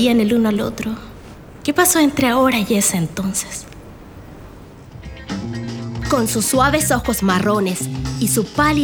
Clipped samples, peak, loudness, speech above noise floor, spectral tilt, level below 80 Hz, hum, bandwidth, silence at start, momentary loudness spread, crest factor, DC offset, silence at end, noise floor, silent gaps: under 0.1%; -2 dBFS; -17 LUFS; 22 dB; -4 dB/octave; -38 dBFS; none; over 20 kHz; 0 s; 18 LU; 18 dB; under 0.1%; 0 s; -38 dBFS; none